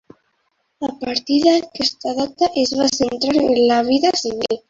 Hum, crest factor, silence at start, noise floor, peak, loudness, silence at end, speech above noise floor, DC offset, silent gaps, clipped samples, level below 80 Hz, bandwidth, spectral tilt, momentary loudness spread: none; 16 dB; 0.8 s; -68 dBFS; -2 dBFS; -18 LUFS; 0.1 s; 50 dB; under 0.1%; none; under 0.1%; -54 dBFS; 7.8 kHz; -3 dB/octave; 8 LU